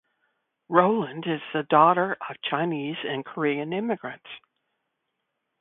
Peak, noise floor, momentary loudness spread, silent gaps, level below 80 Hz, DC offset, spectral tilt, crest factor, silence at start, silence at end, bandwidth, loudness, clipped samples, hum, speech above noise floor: -2 dBFS; -80 dBFS; 14 LU; none; -72 dBFS; under 0.1%; -10 dB/octave; 24 dB; 0.7 s; 1.2 s; 4 kHz; -25 LUFS; under 0.1%; none; 55 dB